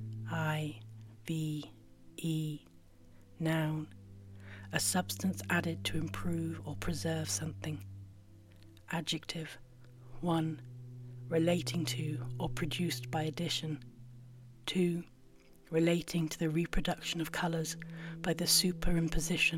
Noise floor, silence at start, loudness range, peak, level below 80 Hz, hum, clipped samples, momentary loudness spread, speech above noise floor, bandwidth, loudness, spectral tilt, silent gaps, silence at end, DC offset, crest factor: -58 dBFS; 0 s; 7 LU; -16 dBFS; -48 dBFS; none; under 0.1%; 19 LU; 24 dB; 16.5 kHz; -35 LUFS; -4.5 dB/octave; none; 0 s; under 0.1%; 20 dB